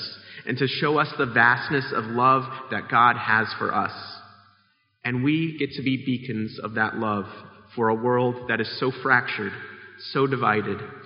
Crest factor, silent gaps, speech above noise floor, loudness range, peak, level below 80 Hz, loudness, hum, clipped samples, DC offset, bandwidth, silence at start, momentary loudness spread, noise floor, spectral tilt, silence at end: 22 dB; none; 42 dB; 6 LU; -2 dBFS; -66 dBFS; -23 LUFS; none; under 0.1%; under 0.1%; 5.4 kHz; 0 s; 16 LU; -65 dBFS; -3.5 dB/octave; 0 s